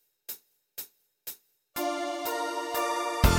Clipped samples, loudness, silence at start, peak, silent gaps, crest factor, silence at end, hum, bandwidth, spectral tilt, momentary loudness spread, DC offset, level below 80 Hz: under 0.1%; -33 LUFS; 0.3 s; -6 dBFS; none; 24 dB; 0 s; none; 17 kHz; -4.5 dB/octave; 14 LU; under 0.1%; -36 dBFS